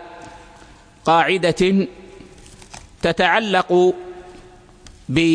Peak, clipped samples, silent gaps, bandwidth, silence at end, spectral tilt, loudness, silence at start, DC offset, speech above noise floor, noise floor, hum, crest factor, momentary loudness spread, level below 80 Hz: -2 dBFS; under 0.1%; none; 10.5 kHz; 0 s; -5.5 dB/octave; -18 LUFS; 0 s; under 0.1%; 29 dB; -45 dBFS; none; 18 dB; 24 LU; -48 dBFS